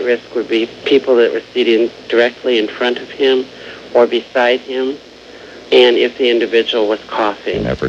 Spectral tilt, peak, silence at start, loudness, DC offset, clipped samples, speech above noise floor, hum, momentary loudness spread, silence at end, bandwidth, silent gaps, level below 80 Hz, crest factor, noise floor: -5 dB/octave; 0 dBFS; 0 s; -14 LUFS; under 0.1%; under 0.1%; 22 dB; none; 9 LU; 0 s; 7.8 kHz; none; -46 dBFS; 14 dB; -36 dBFS